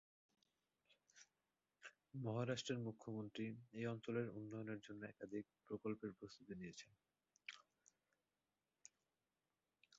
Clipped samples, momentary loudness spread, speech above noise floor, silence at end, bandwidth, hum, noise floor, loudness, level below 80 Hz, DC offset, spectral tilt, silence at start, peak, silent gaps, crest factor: under 0.1%; 21 LU; over 41 dB; 2.35 s; 7.6 kHz; none; under -90 dBFS; -50 LUFS; -84 dBFS; under 0.1%; -5.5 dB/octave; 0.9 s; -32 dBFS; none; 22 dB